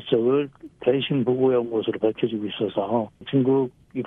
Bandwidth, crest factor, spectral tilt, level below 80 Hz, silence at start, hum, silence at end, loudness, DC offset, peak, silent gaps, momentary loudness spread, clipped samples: 3.9 kHz; 16 dB; -9.5 dB/octave; -62 dBFS; 0 s; none; 0 s; -23 LUFS; under 0.1%; -8 dBFS; none; 6 LU; under 0.1%